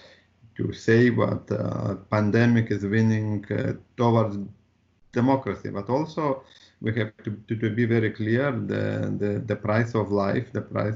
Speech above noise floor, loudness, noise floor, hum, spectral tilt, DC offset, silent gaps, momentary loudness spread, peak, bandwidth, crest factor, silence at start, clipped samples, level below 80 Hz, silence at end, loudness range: 37 dB; -25 LUFS; -62 dBFS; none; -7 dB/octave; under 0.1%; none; 11 LU; -6 dBFS; 7.4 kHz; 18 dB; 0.6 s; under 0.1%; -58 dBFS; 0 s; 4 LU